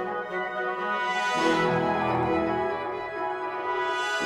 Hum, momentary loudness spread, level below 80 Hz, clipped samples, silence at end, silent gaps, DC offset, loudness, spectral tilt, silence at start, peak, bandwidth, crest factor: none; 7 LU; -56 dBFS; under 0.1%; 0 s; none; under 0.1%; -27 LUFS; -5 dB/octave; 0 s; -12 dBFS; 13.5 kHz; 16 dB